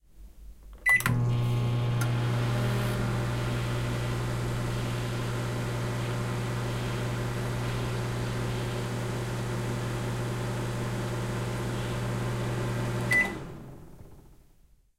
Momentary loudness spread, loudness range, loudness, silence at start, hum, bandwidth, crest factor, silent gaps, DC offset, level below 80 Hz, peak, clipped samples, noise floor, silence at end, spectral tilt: 7 LU; 5 LU; -30 LUFS; 0.15 s; none; 16 kHz; 22 dB; none; under 0.1%; -44 dBFS; -8 dBFS; under 0.1%; -60 dBFS; 0.65 s; -5.5 dB/octave